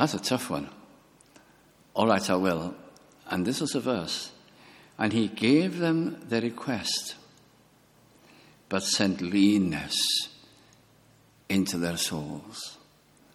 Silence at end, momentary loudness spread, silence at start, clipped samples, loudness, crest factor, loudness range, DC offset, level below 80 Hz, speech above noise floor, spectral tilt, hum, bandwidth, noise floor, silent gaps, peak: 0.6 s; 15 LU; 0 s; under 0.1%; -27 LUFS; 22 dB; 3 LU; under 0.1%; -64 dBFS; 33 dB; -4 dB/octave; none; 16 kHz; -60 dBFS; none; -6 dBFS